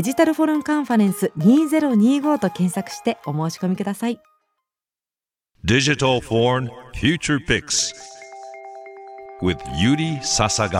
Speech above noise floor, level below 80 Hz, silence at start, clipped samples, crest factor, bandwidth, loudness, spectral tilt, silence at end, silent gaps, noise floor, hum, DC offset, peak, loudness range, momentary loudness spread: over 71 dB; -46 dBFS; 0 s; under 0.1%; 18 dB; 16 kHz; -20 LUFS; -4.5 dB/octave; 0 s; none; under -90 dBFS; none; under 0.1%; -4 dBFS; 5 LU; 21 LU